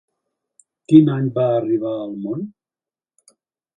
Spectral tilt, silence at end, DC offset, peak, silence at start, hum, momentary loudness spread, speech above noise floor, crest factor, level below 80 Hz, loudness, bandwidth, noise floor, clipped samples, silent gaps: -9.5 dB/octave; 1.25 s; under 0.1%; 0 dBFS; 0.9 s; none; 15 LU; over 73 dB; 20 dB; -64 dBFS; -18 LUFS; 9.2 kHz; under -90 dBFS; under 0.1%; none